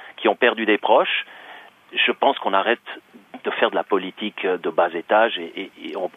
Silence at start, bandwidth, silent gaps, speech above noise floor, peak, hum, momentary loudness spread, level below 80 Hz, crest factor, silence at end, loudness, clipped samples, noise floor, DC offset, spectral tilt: 0 s; 5.2 kHz; none; 23 dB; -2 dBFS; none; 15 LU; -78 dBFS; 20 dB; 0.1 s; -21 LUFS; under 0.1%; -44 dBFS; under 0.1%; -5.5 dB/octave